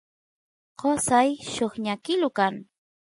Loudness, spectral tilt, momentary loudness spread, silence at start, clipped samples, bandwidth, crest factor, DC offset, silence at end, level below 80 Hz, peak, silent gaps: -25 LUFS; -3.5 dB/octave; 8 LU; 0.8 s; under 0.1%; 11.5 kHz; 18 dB; under 0.1%; 0.45 s; -62 dBFS; -8 dBFS; none